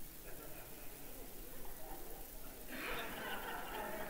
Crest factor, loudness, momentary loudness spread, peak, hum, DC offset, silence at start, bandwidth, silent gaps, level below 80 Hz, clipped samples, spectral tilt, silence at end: 16 dB; -48 LUFS; 8 LU; -30 dBFS; none; 0.2%; 0 s; 16 kHz; none; -54 dBFS; under 0.1%; -3 dB/octave; 0 s